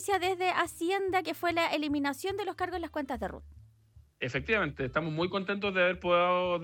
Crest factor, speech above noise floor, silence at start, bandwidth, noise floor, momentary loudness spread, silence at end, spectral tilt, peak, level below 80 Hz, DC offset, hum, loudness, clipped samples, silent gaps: 18 dB; 29 dB; 0 s; 17.5 kHz; -60 dBFS; 9 LU; 0 s; -5 dB/octave; -12 dBFS; -56 dBFS; under 0.1%; none; -31 LUFS; under 0.1%; none